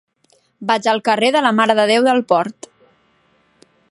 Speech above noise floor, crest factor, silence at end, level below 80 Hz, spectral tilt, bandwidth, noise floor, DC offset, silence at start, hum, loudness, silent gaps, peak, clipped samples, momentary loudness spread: 44 dB; 18 dB; 1.4 s; -70 dBFS; -4 dB/octave; 11.5 kHz; -59 dBFS; under 0.1%; 0.6 s; none; -15 LUFS; none; 0 dBFS; under 0.1%; 6 LU